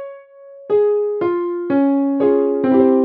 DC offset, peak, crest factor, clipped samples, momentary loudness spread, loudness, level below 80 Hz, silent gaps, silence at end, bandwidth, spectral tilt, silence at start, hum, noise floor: under 0.1%; -2 dBFS; 14 dB; under 0.1%; 5 LU; -17 LUFS; -64 dBFS; none; 0 s; 4.1 kHz; -10.5 dB/octave; 0 s; none; -40 dBFS